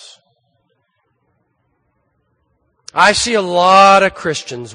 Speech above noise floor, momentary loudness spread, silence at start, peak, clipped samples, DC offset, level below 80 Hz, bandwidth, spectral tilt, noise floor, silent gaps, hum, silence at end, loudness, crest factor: 53 dB; 15 LU; 2.95 s; 0 dBFS; under 0.1%; under 0.1%; -50 dBFS; 10.5 kHz; -3 dB/octave; -65 dBFS; none; none; 0 s; -11 LUFS; 16 dB